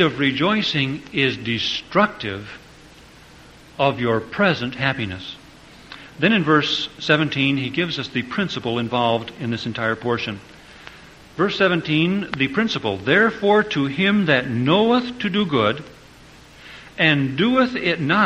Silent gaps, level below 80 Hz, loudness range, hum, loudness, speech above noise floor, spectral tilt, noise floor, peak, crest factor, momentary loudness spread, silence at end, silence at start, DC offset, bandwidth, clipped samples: none; -52 dBFS; 5 LU; none; -20 LUFS; 26 dB; -6 dB/octave; -46 dBFS; -2 dBFS; 20 dB; 18 LU; 0 s; 0 s; under 0.1%; 10.5 kHz; under 0.1%